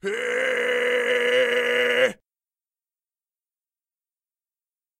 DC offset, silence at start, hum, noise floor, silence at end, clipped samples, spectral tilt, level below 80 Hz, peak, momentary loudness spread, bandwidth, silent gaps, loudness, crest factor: under 0.1%; 0.05 s; none; under -90 dBFS; 2.85 s; under 0.1%; -2 dB/octave; -76 dBFS; -8 dBFS; 4 LU; 15.5 kHz; none; -21 LUFS; 18 dB